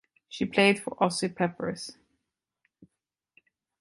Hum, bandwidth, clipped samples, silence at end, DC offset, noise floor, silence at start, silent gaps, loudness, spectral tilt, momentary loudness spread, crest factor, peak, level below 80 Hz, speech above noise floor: none; 11.5 kHz; under 0.1%; 1.9 s; under 0.1%; -86 dBFS; 0.3 s; none; -27 LUFS; -4.5 dB/octave; 17 LU; 22 dB; -8 dBFS; -68 dBFS; 59 dB